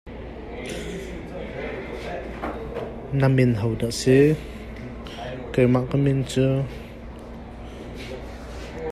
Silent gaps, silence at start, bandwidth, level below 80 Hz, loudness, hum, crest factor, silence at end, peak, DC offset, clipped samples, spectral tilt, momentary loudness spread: none; 0.05 s; 13.5 kHz; -40 dBFS; -24 LUFS; none; 18 dB; 0 s; -6 dBFS; under 0.1%; under 0.1%; -7 dB/octave; 19 LU